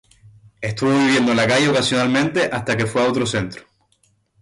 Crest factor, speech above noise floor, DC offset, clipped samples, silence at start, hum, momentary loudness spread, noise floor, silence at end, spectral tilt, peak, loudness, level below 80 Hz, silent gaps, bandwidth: 12 dB; 44 dB; under 0.1%; under 0.1%; 0.6 s; none; 11 LU; -62 dBFS; 0.8 s; -4.5 dB/octave; -6 dBFS; -18 LUFS; -52 dBFS; none; 11.5 kHz